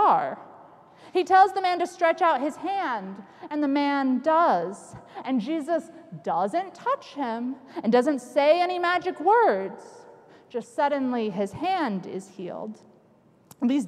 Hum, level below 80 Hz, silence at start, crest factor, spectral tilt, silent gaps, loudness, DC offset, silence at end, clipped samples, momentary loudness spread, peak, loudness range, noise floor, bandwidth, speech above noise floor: none; -72 dBFS; 0 s; 18 dB; -5.5 dB/octave; none; -25 LUFS; under 0.1%; 0 s; under 0.1%; 16 LU; -6 dBFS; 6 LU; -58 dBFS; 13 kHz; 34 dB